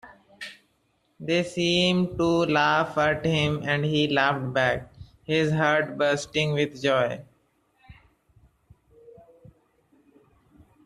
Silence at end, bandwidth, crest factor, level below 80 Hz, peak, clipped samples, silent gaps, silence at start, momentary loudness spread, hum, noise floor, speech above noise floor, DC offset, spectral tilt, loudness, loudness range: 2.95 s; 11.5 kHz; 20 dB; -56 dBFS; -8 dBFS; under 0.1%; none; 0.05 s; 14 LU; none; -69 dBFS; 46 dB; under 0.1%; -5.5 dB/octave; -24 LUFS; 7 LU